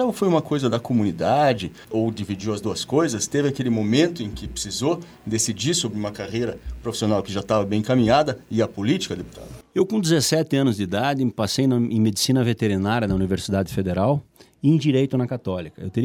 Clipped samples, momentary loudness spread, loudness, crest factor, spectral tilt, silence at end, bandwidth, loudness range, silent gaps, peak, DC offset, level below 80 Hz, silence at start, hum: under 0.1%; 9 LU; -22 LUFS; 16 dB; -5.5 dB/octave; 0 s; 17.5 kHz; 3 LU; none; -4 dBFS; under 0.1%; -46 dBFS; 0 s; none